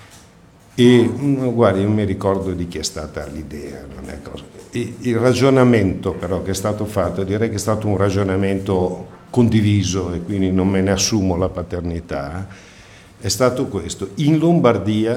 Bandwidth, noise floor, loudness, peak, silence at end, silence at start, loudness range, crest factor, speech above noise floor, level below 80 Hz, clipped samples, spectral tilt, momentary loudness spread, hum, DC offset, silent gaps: 16 kHz; -47 dBFS; -18 LUFS; 0 dBFS; 0 s; 0 s; 4 LU; 18 dB; 29 dB; -42 dBFS; under 0.1%; -6 dB/octave; 17 LU; none; under 0.1%; none